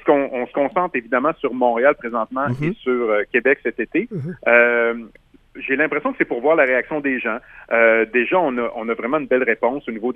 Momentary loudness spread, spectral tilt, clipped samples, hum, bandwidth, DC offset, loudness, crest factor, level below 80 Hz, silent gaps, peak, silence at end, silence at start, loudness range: 9 LU; -8.5 dB/octave; under 0.1%; none; 3.8 kHz; under 0.1%; -19 LUFS; 18 dB; -56 dBFS; none; 0 dBFS; 0 s; 0.05 s; 2 LU